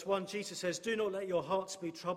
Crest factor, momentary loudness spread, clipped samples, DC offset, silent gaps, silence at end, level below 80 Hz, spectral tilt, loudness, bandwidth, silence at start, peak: 16 dB; 6 LU; under 0.1%; under 0.1%; none; 0 s; -76 dBFS; -4 dB/octave; -37 LUFS; 16 kHz; 0 s; -20 dBFS